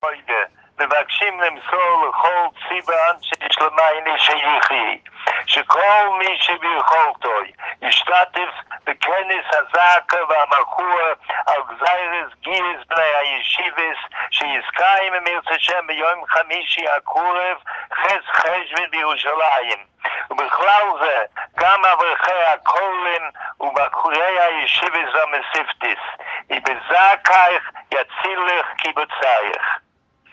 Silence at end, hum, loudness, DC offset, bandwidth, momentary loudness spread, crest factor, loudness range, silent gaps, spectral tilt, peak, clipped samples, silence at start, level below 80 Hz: 0.55 s; none; -17 LUFS; under 0.1%; 8.2 kHz; 9 LU; 18 dB; 3 LU; none; -1 dB/octave; 0 dBFS; under 0.1%; 0.05 s; -68 dBFS